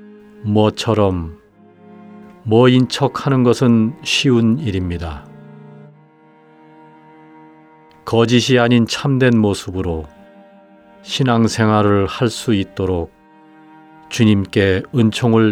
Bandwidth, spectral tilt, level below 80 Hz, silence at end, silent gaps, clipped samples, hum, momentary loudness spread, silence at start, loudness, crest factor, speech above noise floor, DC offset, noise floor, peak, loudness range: 13.5 kHz; -6 dB/octave; -44 dBFS; 0 s; none; under 0.1%; none; 13 LU; 0.4 s; -16 LUFS; 16 dB; 33 dB; under 0.1%; -48 dBFS; 0 dBFS; 6 LU